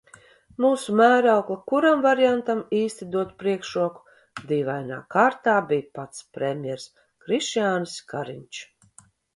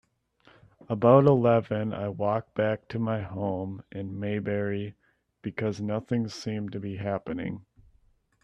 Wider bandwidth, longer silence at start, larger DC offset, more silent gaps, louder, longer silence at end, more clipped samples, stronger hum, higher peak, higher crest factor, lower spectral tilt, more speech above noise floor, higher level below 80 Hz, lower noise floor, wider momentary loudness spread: first, 11.5 kHz vs 8.8 kHz; second, 0.6 s vs 0.9 s; neither; neither; first, -23 LUFS vs -28 LUFS; second, 0.7 s vs 0.85 s; neither; neither; about the same, -4 dBFS vs -6 dBFS; about the same, 18 dB vs 22 dB; second, -5 dB/octave vs -8 dB/octave; second, 33 dB vs 38 dB; second, -68 dBFS vs -62 dBFS; second, -56 dBFS vs -65 dBFS; about the same, 18 LU vs 17 LU